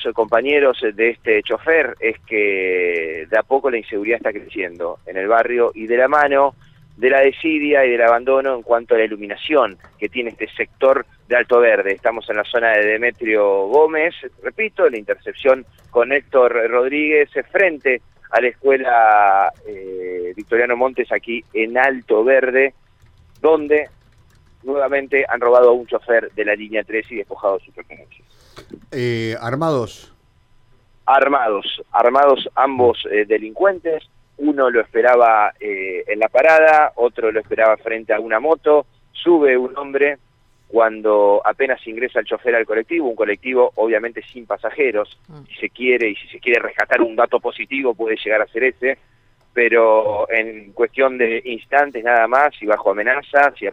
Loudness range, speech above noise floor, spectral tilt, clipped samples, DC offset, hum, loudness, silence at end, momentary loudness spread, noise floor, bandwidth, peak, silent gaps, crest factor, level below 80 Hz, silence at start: 4 LU; 36 dB; -6 dB/octave; under 0.1%; under 0.1%; none; -17 LUFS; 0 s; 11 LU; -53 dBFS; 7.8 kHz; -2 dBFS; none; 16 dB; -56 dBFS; 0 s